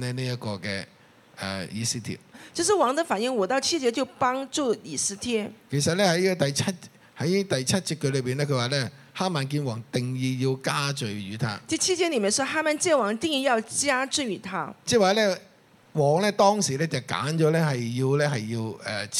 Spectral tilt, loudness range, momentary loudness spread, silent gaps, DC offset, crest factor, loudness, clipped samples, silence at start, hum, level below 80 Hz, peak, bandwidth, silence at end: -4 dB/octave; 3 LU; 10 LU; none; under 0.1%; 20 dB; -25 LUFS; under 0.1%; 0 s; none; -66 dBFS; -6 dBFS; 15 kHz; 0 s